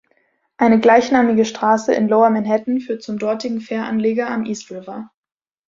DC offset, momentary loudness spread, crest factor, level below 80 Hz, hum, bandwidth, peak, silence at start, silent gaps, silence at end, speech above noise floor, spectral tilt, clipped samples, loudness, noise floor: under 0.1%; 14 LU; 16 dB; -60 dBFS; none; 7.6 kHz; -2 dBFS; 0.6 s; none; 0.6 s; 47 dB; -5.5 dB/octave; under 0.1%; -17 LUFS; -63 dBFS